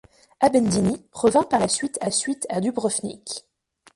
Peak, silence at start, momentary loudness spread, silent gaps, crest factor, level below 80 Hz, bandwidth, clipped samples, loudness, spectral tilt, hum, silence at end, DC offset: -6 dBFS; 0.4 s; 12 LU; none; 18 dB; -54 dBFS; 11.5 kHz; under 0.1%; -22 LUFS; -4 dB/octave; none; 0.55 s; under 0.1%